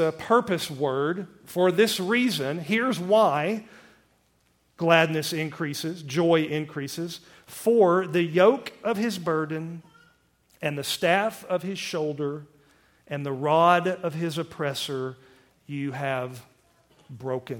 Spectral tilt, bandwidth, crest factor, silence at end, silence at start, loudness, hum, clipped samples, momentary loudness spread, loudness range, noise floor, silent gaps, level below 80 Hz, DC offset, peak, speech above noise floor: -5 dB/octave; 17.5 kHz; 22 dB; 0 s; 0 s; -25 LUFS; none; under 0.1%; 14 LU; 5 LU; -66 dBFS; none; -70 dBFS; under 0.1%; -4 dBFS; 41 dB